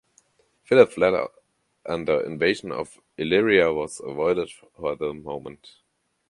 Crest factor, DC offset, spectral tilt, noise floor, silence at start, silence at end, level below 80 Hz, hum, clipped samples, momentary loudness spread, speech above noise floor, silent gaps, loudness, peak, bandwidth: 22 dB; under 0.1%; -5 dB/octave; -63 dBFS; 0.7 s; 0.75 s; -58 dBFS; none; under 0.1%; 17 LU; 40 dB; none; -23 LUFS; -2 dBFS; 11.5 kHz